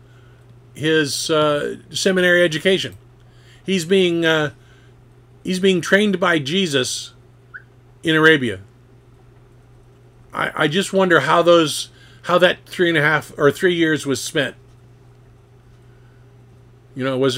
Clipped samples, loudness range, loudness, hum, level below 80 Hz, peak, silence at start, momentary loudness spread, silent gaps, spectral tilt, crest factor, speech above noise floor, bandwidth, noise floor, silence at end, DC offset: under 0.1%; 5 LU; -17 LUFS; none; -56 dBFS; 0 dBFS; 0.75 s; 12 LU; none; -4 dB/octave; 20 dB; 31 dB; 16.5 kHz; -48 dBFS; 0 s; under 0.1%